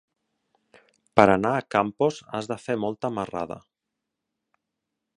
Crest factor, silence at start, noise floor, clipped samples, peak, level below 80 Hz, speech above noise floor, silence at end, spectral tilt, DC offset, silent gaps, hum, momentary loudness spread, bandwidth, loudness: 26 dB; 1.15 s; -84 dBFS; under 0.1%; 0 dBFS; -60 dBFS; 60 dB; 1.6 s; -6.5 dB/octave; under 0.1%; none; none; 14 LU; 10.5 kHz; -24 LUFS